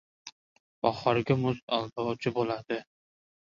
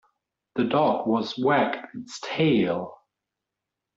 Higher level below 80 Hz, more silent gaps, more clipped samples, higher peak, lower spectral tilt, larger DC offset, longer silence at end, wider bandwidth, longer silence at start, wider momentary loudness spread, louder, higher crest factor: about the same, -64 dBFS vs -66 dBFS; first, 0.32-0.82 s, 1.62-1.68 s vs none; neither; about the same, -8 dBFS vs -10 dBFS; about the same, -7 dB/octave vs -6 dB/octave; neither; second, 0.7 s vs 1 s; about the same, 7.4 kHz vs 8 kHz; second, 0.25 s vs 0.55 s; first, 16 LU vs 13 LU; second, -30 LUFS vs -24 LUFS; first, 22 dB vs 16 dB